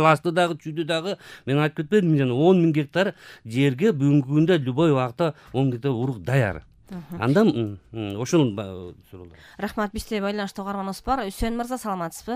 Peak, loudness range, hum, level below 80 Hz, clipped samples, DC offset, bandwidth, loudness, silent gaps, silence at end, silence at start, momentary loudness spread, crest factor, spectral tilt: -4 dBFS; 7 LU; none; -46 dBFS; under 0.1%; under 0.1%; 15.5 kHz; -23 LUFS; none; 0 s; 0 s; 13 LU; 18 dB; -7 dB/octave